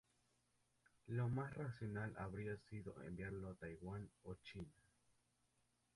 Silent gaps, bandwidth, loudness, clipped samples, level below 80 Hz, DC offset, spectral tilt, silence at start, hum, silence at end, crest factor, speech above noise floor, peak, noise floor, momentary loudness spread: none; 11.5 kHz; -50 LUFS; under 0.1%; -68 dBFS; under 0.1%; -8 dB/octave; 1.05 s; none; 1.25 s; 16 dB; 35 dB; -34 dBFS; -83 dBFS; 12 LU